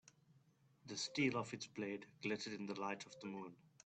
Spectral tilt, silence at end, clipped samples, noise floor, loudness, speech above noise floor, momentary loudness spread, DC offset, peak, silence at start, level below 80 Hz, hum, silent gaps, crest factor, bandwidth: -4 dB/octave; 0.2 s; under 0.1%; -73 dBFS; -45 LUFS; 28 dB; 12 LU; under 0.1%; -26 dBFS; 0.85 s; -84 dBFS; none; none; 20 dB; 9 kHz